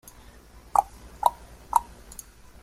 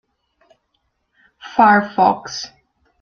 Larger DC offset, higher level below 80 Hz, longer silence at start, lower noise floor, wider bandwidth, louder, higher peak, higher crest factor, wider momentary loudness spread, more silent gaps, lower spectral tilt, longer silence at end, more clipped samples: neither; first, -50 dBFS vs -60 dBFS; second, 0.75 s vs 1.45 s; second, -50 dBFS vs -69 dBFS; first, 16 kHz vs 7 kHz; second, -27 LUFS vs -16 LUFS; about the same, -2 dBFS vs 0 dBFS; first, 28 dB vs 20 dB; first, 19 LU vs 16 LU; neither; second, -3 dB/octave vs -4.5 dB/octave; first, 0.8 s vs 0.55 s; neither